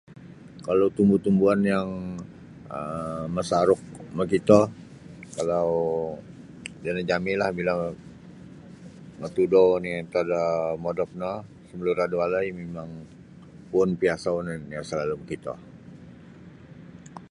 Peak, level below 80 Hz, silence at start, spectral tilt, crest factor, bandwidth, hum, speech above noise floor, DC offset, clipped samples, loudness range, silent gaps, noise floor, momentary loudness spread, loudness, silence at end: -4 dBFS; -56 dBFS; 0.1 s; -7 dB/octave; 24 dB; 11.5 kHz; none; 22 dB; under 0.1%; under 0.1%; 5 LU; none; -47 dBFS; 25 LU; -25 LUFS; 0.05 s